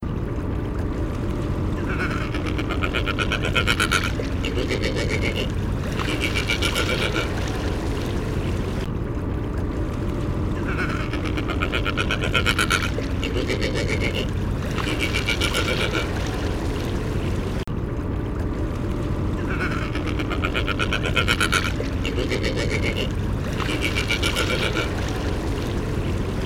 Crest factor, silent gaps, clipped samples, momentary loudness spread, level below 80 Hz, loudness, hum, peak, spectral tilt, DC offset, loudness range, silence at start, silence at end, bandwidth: 20 dB; none; under 0.1%; 6 LU; -30 dBFS; -24 LUFS; none; -4 dBFS; -5 dB/octave; under 0.1%; 3 LU; 0 s; 0 s; 16.5 kHz